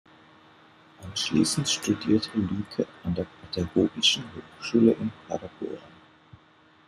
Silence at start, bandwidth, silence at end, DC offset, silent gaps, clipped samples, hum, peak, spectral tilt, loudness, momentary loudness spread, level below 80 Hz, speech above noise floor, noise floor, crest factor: 1 s; 14 kHz; 1 s; under 0.1%; none; under 0.1%; none; -8 dBFS; -4 dB/octave; -26 LUFS; 15 LU; -58 dBFS; 32 dB; -58 dBFS; 20 dB